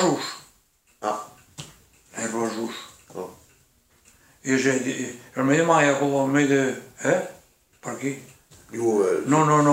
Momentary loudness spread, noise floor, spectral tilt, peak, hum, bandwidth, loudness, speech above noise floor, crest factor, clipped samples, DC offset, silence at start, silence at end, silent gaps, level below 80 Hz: 21 LU; -62 dBFS; -5 dB/octave; -6 dBFS; none; 16 kHz; -23 LUFS; 41 dB; 20 dB; under 0.1%; under 0.1%; 0 s; 0 s; none; -68 dBFS